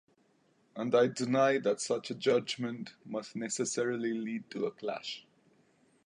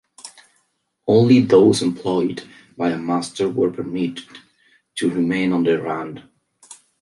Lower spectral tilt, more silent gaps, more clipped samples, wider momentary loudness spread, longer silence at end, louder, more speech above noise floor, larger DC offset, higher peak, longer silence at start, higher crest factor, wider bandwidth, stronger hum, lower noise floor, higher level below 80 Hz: second, -4 dB/octave vs -6 dB/octave; neither; neither; second, 12 LU vs 21 LU; first, 0.85 s vs 0.3 s; second, -33 LUFS vs -19 LUFS; second, 38 dB vs 51 dB; neither; second, -14 dBFS vs -2 dBFS; first, 0.75 s vs 0.25 s; about the same, 20 dB vs 18 dB; about the same, 11 kHz vs 11.5 kHz; neither; about the same, -70 dBFS vs -69 dBFS; second, -82 dBFS vs -60 dBFS